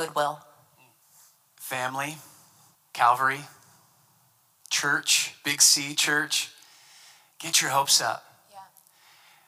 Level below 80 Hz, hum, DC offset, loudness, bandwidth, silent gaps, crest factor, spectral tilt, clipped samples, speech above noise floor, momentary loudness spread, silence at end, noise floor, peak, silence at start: -86 dBFS; none; under 0.1%; -23 LUFS; 16.5 kHz; none; 24 dB; 0 dB/octave; under 0.1%; 39 dB; 19 LU; 0.85 s; -64 dBFS; -4 dBFS; 0 s